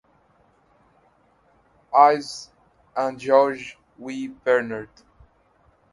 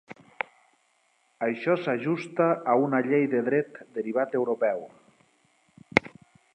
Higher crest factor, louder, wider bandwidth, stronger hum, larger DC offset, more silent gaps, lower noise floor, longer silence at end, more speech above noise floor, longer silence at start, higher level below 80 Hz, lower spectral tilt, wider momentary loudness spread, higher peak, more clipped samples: about the same, 24 dB vs 28 dB; first, -21 LUFS vs -27 LUFS; first, 11.5 kHz vs 9 kHz; neither; neither; neither; second, -61 dBFS vs -68 dBFS; first, 1.1 s vs 0.45 s; about the same, 40 dB vs 42 dB; first, 1.9 s vs 0.1 s; about the same, -66 dBFS vs -68 dBFS; second, -4.5 dB/octave vs -7 dB/octave; first, 21 LU vs 12 LU; about the same, 0 dBFS vs 0 dBFS; neither